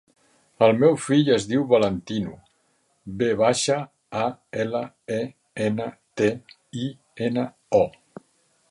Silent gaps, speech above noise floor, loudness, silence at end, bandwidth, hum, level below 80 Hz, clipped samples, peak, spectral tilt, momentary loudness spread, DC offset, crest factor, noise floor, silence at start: none; 45 dB; -23 LUFS; 0.8 s; 11.5 kHz; none; -58 dBFS; under 0.1%; -4 dBFS; -5.5 dB/octave; 13 LU; under 0.1%; 20 dB; -67 dBFS; 0.6 s